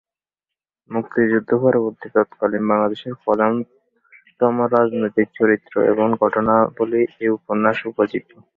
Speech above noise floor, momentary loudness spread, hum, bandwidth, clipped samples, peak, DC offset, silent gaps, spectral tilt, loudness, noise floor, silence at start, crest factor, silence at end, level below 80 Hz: 69 dB; 6 LU; none; 4.5 kHz; under 0.1%; -2 dBFS; under 0.1%; none; -9.5 dB/octave; -19 LUFS; -88 dBFS; 0.9 s; 18 dB; 0.35 s; -60 dBFS